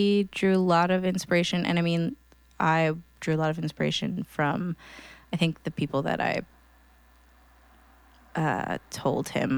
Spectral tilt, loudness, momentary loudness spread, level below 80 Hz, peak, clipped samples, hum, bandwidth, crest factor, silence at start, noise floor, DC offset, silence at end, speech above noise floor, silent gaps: -6 dB/octave; -27 LUFS; 10 LU; -58 dBFS; -10 dBFS; under 0.1%; none; 19.5 kHz; 18 dB; 0 s; -57 dBFS; under 0.1%; 0 s; 31 dB; none